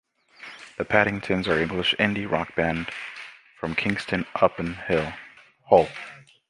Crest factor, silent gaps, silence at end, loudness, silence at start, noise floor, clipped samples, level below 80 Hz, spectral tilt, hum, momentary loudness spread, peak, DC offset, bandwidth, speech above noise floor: 24 dB; none; 0.3 s; -24 LUFS; 0.4 s; -46 dBFS; under 0.1%; -50 dBFS; -6 dB/octave; none; 20 LU; -2 dBFS; under 0.1%; 11.5 kHz; 22 dB